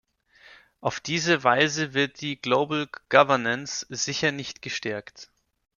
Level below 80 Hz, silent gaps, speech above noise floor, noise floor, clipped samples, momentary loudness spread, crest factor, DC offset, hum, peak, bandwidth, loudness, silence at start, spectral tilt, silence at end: -66 dBFS; none; 30 dB; -55 dBFS; under 0.1%; 12 LU; 24 dB; under 0.1%; none; -4 dBFS; 7.4 kHz; -24 LUFS; 0.85 s; -3.5 dB/octave; 0.55 s